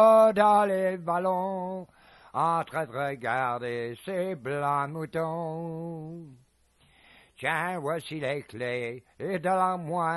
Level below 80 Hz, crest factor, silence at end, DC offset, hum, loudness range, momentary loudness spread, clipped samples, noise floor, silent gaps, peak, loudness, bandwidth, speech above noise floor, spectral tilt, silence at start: -70 dBFS; 18 dB; 0 s; under 0.1%; none; 7 LU; 15 LU; under 0.1%; -64 dBFS; none; -8 dBFS; -28 LUFS; 12.5 kHz; 36 dB; -6.5 dB/octave; 0 s